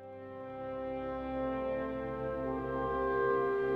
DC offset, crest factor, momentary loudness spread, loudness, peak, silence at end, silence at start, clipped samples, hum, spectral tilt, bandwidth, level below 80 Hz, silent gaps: under 0.1%; 14 dB; 12 LU; -35 LUFS; -20 dBFS; 0 s; 0 s; under 0.1%; none; -8.5 dB/octave; 5.4 kHz; -54 dBFS; none